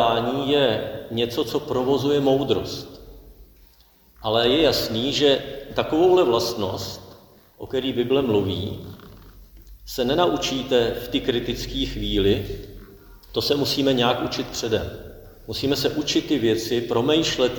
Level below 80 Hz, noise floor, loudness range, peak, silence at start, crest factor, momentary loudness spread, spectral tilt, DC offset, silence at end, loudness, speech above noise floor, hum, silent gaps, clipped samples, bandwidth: -42 dBFS; -55 dBFS; 4 LU; -4 dBFS; 0 s; 18 dB; 14 LU; -5 dB/octave; under 0.1%; 0 s; -22 LUFS; 33 dB; none; none; under 0.1%; 19.5 kHz